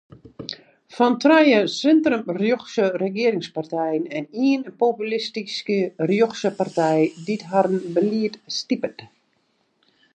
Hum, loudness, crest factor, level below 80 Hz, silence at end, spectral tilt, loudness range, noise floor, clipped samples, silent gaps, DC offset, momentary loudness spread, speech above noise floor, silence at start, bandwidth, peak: none; -21 LUFS; 18 dB; -70 dBFS; 1.1 s; -5.5 dB/octave; 4 LU; -67 dBFS; under 0.1%; none; under 0.1%; 11 LU; 47 dB; 0.4 s; 9 kHz; -4 dBFS